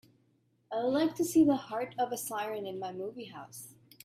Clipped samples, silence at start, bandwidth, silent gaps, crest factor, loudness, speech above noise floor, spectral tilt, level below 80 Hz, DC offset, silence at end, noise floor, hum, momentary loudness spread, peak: under 0.1%; 0.7 s; 16 kHz; none; 18 dB; -32 LUFS; 40 dB; -4.5 dB/octave; -74 dBFS; under 0.1%; 0.3 s; -71 dBFS; none; 19 LU; -14 dBFS